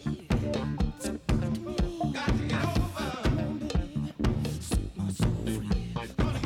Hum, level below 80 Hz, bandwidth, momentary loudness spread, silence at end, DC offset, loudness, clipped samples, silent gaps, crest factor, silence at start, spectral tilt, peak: none; -36 dBFS; 16.5 kHz; 4 LU; 0 s; under 0.1%; -31 LUFS; under 0.1%; none; 16 dB; 0 s; -6.5 dB/octave; -14 dBFS